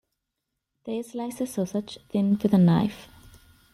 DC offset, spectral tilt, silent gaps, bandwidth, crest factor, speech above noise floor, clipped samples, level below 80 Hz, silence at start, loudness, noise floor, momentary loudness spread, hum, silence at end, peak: under 0.1%; -7.5 dB/octave; none; 13 kHz; 18 dB; 58 dB; under 0.1%; -58 dBFS; 0.85 s; -25 LUFS; -82 dBFS; 14 LU; none; 0.7 s; -8 dBFS